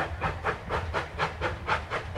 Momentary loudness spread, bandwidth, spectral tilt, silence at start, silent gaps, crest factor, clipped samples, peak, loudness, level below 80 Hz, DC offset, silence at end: 3 LU; 12.5 kHz; -5.5 dB/octave; 0 s; none; 18 dB; under 0.1%; -14 dBFS; -31 LUFS; -44 dBFS; under 0.1%; 0 s